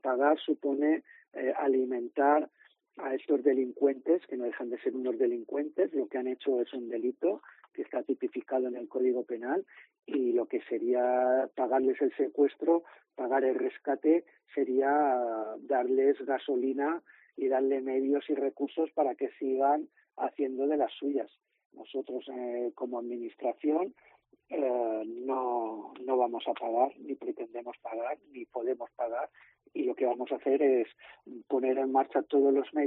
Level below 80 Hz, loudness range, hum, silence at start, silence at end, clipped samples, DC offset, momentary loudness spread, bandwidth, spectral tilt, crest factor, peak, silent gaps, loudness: -88 dBFS; 5 LU; none; 0.05 s; 0 s; under 0.1%; under 0.1%; 12 LU; 4 kHz; -2.5 dB/octave; 18 dB; -14 dBFS; 21.66-21.70 s; -31 LUFS